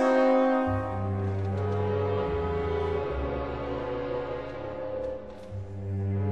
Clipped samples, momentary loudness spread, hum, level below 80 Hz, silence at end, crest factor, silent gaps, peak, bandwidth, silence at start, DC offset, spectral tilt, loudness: under 0.1%; 13 LU; none; -44 dBFS; 0 s; 16 dB; none; -12 dBFS; 7.8 kHz; 0 s; 0.3%; -8.5 dB/octave; -29 LUFS